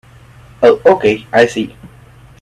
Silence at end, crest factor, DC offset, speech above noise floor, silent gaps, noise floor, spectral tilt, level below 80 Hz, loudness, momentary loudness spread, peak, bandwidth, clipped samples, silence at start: 0.55 s; 14 dB; under 0.1%; 29 dB; none; -41 dBFS; -5.5 dB/octave; -48 dBFS; -12 LUFS; 10 LU; 0 dBFS; 11.5 kHz; under 0.1%; 0.6 s